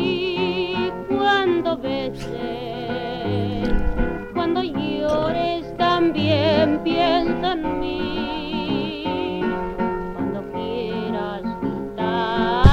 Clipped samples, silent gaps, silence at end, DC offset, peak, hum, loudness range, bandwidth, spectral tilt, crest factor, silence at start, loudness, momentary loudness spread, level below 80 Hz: under 0.1%; none; 0 s; under 0.1%; -4 dBFS; none; 5 LU; 9.6 kHz; -7.5 dB/octave; 18 dB; 0 s; -22 LUFS; 9 LU; -32 dBFS